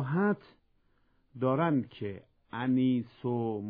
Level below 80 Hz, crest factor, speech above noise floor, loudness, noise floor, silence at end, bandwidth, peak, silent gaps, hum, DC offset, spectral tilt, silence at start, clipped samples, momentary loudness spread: -70 dBFS; 16 dB; 39 dB; -31 LUFS; -69 dBFS; 0 s; 4.8 kHz; -16 dBFS; none; none; under 0.1%; -11 dB/octave; 0 s; under 0.1%; 13 LU